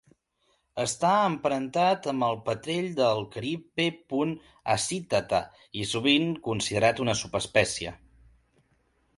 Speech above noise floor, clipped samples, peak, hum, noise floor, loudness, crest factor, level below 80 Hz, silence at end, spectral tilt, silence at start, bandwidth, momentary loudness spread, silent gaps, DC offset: 44 dB; under 0.1%; -6 dBFS; none; -72 dBFS; -27 LUFS; 22 dB; -58 dBFS; 1.25 s; -4 dB/octave; 0.75 s; 11.5 kHz; 9 LU; none; under 0.1%